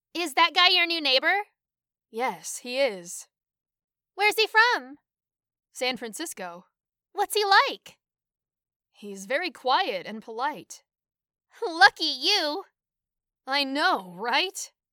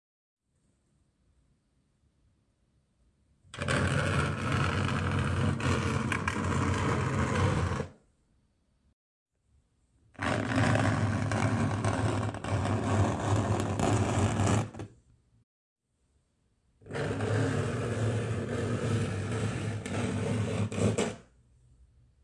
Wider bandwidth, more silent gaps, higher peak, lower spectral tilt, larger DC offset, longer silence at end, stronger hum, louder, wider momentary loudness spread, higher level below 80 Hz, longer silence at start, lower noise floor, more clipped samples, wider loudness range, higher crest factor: first, 19 kHz vs 11.5 kHz; second, 3.84-3.88 s, 8.76-8.80 s vs 8.93-9.26 s, 15.43-15.76 s; first, -2 dBFS vs -12 dBFS; second, -1 dB/octave vs -6 dB/octave; neither; second, 0.25 s vs 1 s; neither; first, -24 LUFS vs -30 LUFS; first, 19 LU vs 6 LU; second, -82 dBFS vs -52 dBFS; second, 0.15 s vs 3.55 s; first, -90 dBFS vs -73 dBFS; neither; about the same, 7 LU vs 6 LU; about the same, 24 dB vs 20 dB